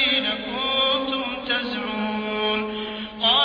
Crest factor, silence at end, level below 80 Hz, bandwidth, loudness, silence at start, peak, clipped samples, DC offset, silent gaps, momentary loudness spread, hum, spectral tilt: 16 dB; 0 s; -54 dBFS; 5.2 kHz; -23 LUFS; 0 s; -8 dBFS; under 0.1%; under 0.1%; none; 7 LU; none; -5.5 dB/octave